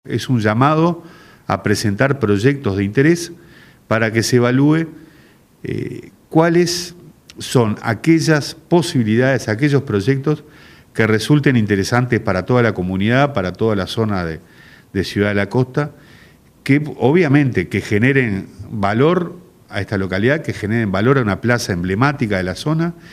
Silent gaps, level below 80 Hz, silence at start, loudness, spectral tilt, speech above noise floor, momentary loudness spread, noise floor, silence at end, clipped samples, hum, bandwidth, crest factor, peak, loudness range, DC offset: none; -52 dBFS; 0.05 s; -17 LUFS; -6 dB/octave; 32 dB; 12 LU; -48 dBFS; 0 s; under 0.1%; none; 15 kHz; 16 dB; 0 dBFS; 3 LU; under 0.1%